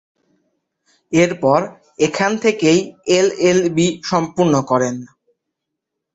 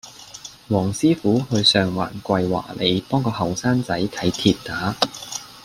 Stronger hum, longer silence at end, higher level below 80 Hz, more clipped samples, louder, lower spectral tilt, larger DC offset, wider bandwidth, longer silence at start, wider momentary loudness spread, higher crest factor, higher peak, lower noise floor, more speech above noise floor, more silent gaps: neither; first, 1.1 s vs 0 s; about the same, -56 dBFS vs -52 dBFS; neither; first, -16 LUFS vs -21 LUFS; about the same, -5 dB/octave vs -5 dB/octave; neither; second, 8.2 kHz vs 16 kHz; first, 1.1 s vs 0.05 s; second, 5 LU vs 14 LU; about the same, 18 dB vs 20 dB; about the same, 0 dBFS vs -2 dBFS; first, -79 dBFS vs -41 dBFS; first, 63 dB vs 20 dB; neither